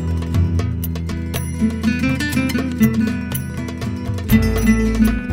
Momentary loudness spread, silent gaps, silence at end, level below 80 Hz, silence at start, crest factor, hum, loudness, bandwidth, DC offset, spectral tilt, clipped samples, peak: 8 LU; none; 0 s; -28 dBFS; 0 s; 16 dB; none; -19 LUFS; 16.5 kHz; under 0.1%; -6.5 dB/octave; under 0.1%; -2 dBFS